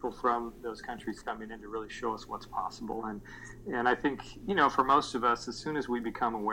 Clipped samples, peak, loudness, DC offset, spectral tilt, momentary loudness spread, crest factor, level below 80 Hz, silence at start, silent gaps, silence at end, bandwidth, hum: under 0.1%; -10 dBFS; -32 LUFS; under 0.1%; -4.5 dB/octave; 14 LU; 22 dB; -56 dBFS; 0 s; none; 0 s; 17 kHz; none